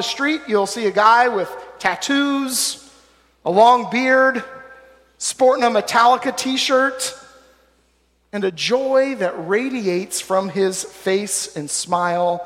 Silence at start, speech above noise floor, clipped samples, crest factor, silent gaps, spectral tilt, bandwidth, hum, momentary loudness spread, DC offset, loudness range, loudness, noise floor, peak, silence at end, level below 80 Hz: 0 s; 43 dB; under 0.1%; 16 dB; none; -3 dB/octave; 16 kHz; none; 11 LU; under 0.1%; 4 LU; -18 LUFS; -61 dBFS; -2 dBFS; 0 s; -62 dBFS